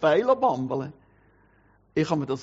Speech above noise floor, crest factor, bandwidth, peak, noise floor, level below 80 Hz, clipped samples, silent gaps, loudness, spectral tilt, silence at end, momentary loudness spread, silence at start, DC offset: 37 dB; 18 dB; 7.6 kHz; -8 dBFS; -61 dBFS; -64 dBFS; under 0.1%; none; -25 LUFS; -5.5 dB/octave; 0 s; 11 LU; 0 s; under 0.1%